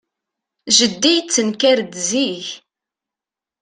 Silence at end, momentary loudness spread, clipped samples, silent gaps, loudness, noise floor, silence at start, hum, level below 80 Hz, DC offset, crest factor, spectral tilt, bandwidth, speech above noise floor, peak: 1.05 s; 14 LU; under 0.1%; none; -15 LUFS; -88 dBFS; 0.65 s; none; -66 dBFS; under 0.1%; 20 dB; -1.5 dB/octave; 10.5 kHz; 71 dB; 0 dBFS